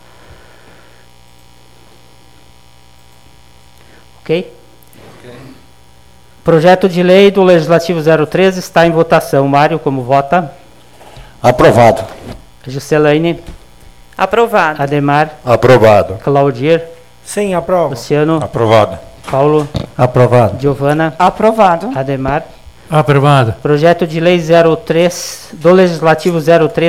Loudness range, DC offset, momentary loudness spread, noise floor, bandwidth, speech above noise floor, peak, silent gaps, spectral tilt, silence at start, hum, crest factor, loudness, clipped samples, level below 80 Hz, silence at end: 9 LU; 0.8%; 11 LU; -44 dBFS; 16 kHz; 34 dB; 0 dBFS; none; -6.5 dB/octave; 4.3 s; 60 Hz at -40 dBFS; 12 dB; -10 LUFS; under 0.1%; -40 dBFS; 0 s